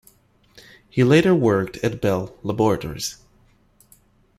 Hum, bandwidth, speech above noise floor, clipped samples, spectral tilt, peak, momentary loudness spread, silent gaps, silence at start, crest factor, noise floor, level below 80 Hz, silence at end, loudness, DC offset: none; 15 kHz; 38 dB; under 0.1%; -6 dB/octave; -2 dBFS; 13 LU; none; 0.95 s; 20 dB; -57 dBFS; -50 dBFS; 1.25 s; -20 LUFS; under 0.1%